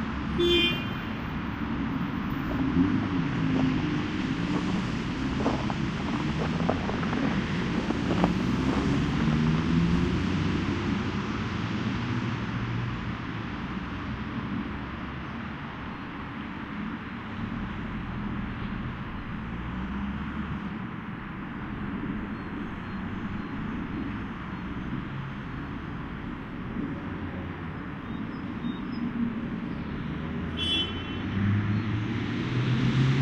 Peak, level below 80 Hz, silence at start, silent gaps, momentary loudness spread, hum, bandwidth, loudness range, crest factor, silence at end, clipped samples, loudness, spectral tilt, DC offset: -6 dBFS; -42 dBFS; 0 s; none; 11 LU; none; 15 kHz; 9 LU; 22 dB; 0 s; under 0.1%; -30 LUFS; -6.5 dB/octave; under 0.1%